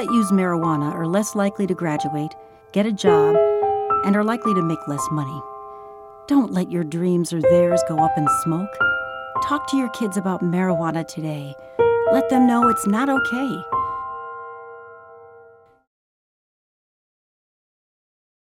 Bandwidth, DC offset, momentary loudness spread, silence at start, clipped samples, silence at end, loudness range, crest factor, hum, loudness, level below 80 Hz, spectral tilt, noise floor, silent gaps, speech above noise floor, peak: 16.5 kHz; under 0.1%; 15 LU; 0 s; under 0.1%; 3.15 s; 6 LU; 18 dB; none; -20 LUFS; -58 dBFS; -6.5 dB/octave; -49 dBFS; none; 30 dB; -4 dBFS